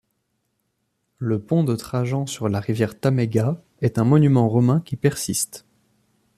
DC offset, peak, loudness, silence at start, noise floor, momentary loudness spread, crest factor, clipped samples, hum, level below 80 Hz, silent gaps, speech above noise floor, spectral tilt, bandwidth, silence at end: under 0.1%; -4 dBFS; -21 LUFS; 1.2 s; -73 dBFS; 9 LU; 18 dB; under 0.1%; none; -56 dBFS; none; 53 dB; -6.5 dB/octave; 14.5 kHz; 0.8 s